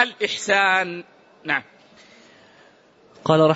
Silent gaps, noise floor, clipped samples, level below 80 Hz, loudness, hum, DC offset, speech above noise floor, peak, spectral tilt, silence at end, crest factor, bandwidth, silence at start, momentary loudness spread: none; -54 dBFS; under 0.1%; -68 dBFS; -21 LUFS; none; under 0.1%; 33 dB; -2 dBFS; -4.5 dB/octave; 0 s; 20 dB; 8 kHz; 0 s; 14 LU